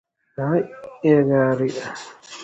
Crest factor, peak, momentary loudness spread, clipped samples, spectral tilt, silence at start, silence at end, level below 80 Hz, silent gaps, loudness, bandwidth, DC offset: 18 dB; -4 dBFS; 20 LU; under 0.1%; -7 dB/octave; 0.4 s; 0 s; -60 dBFS; none; -20 LUFS; 8.2 kHz; under 0.1%